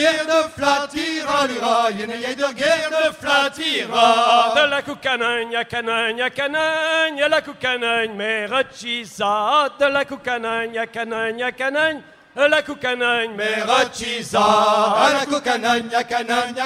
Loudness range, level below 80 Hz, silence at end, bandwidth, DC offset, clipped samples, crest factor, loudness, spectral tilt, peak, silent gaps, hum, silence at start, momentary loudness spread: 3 LU; -58 dBFS; 0 s; 15.5 kHz; under 0.1%; under 0.1%; 18 dB; -19 LUFS; -2.5 dB/octave; -2 dBFS; none; none; 0 s; 8 LU